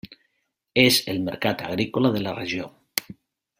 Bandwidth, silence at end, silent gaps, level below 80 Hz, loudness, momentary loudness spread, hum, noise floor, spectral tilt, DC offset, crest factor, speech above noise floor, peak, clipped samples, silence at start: 16.5 kHz; 0.6 s; none; -60 dBFS; -23 LUFS; 12 LU; none; -74 dBFS; -4 dB/octave; under 0.1%; 26 dB; 51 dB; 0 dBFS; under 0.1%; 0.05 s